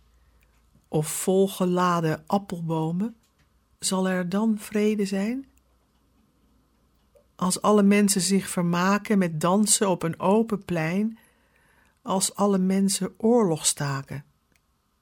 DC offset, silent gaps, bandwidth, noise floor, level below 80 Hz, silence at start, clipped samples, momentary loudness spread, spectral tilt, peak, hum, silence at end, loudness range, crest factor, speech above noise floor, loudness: under 0.1%; none; 17 kHz; -67 dBFS; -62 dBFS; 0.9 s; under 0.1%; 10 LU; -4.5 dB/octave; -6 dBFS; none; 0.8 s; 6 LU; 20 dB; 44 dB; -24 LUFS